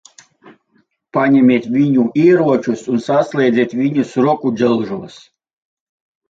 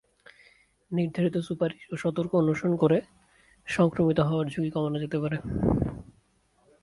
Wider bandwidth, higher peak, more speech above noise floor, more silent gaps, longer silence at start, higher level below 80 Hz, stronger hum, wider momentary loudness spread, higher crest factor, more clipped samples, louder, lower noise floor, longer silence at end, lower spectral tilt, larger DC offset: second, 7.8 kHz vs 11.5 kHz; first, -2 dBFS vs -10 dBFS; first, 46 dB vs 40 dB; neither; first, 1.15 s vs 0.9 s; second, -60 dBFS vs -48 dBFS; neither; about the same, 8 LU vs 8 LU; about the same, 14 dB vs 18 dB; neither; first, -15 LUFS vs -27 LUFS; second, -60 dBFS vs -66 dBFS; first, 1.2 s vs 0.8 s; about the same, -7.5 dB/octave vs -8 dB/octave; neither